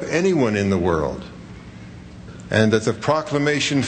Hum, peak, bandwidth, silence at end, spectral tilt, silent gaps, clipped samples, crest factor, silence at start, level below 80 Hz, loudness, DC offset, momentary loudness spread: none; -2 dBFS; 9.2 kHz; 0 s; -5.5 dB/octave; none; under 0.1%; 18 dB; 0 s; -46 dBFS; -20 LUFS; under 0.1%; 21 LU